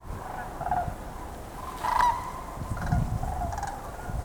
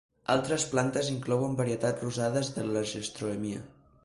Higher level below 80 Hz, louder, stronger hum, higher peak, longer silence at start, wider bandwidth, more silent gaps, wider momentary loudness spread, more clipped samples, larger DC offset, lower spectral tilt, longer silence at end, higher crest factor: first, -38 dBFS vs -62 dBFS; about the same, -31 LUFS vs -30 LUFS; neither; about the same, -10 dBFS vs -12 dBFS; second, 0 s vs 0.3 s; first, over 20 kHz vs 11.5 kHz; neither; first, 15 LU vs 7 LU; neither; neither; about the same, -6 dB/octave vs -5 dB/octave; second, 0 s vs 0.35 s; about the same, 20 dB vs 20 dB